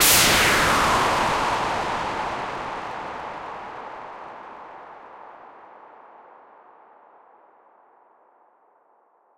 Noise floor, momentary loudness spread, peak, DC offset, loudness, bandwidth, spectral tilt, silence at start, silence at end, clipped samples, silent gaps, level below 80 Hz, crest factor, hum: -61 dBFS; 26 LU; -6 dBFS; under 0.1%; -21 LUFS; 16 kHz; -1.5 dB/octave; 0 s; 3.15 s; under 0.1%; none; -46 dBFS; 20 dB; none